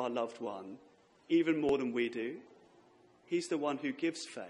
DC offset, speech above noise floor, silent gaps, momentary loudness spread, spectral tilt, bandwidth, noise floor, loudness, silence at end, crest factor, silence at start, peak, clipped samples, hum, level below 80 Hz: under 0.1%; 29 dB; none; 15 LU; -5 dB/octave; 11 kHz; -64 dBFS; -35 LUFS; 0 s; 16 dB; 0 s; -20 dBFS; under 0.1%; none; -74 dBFS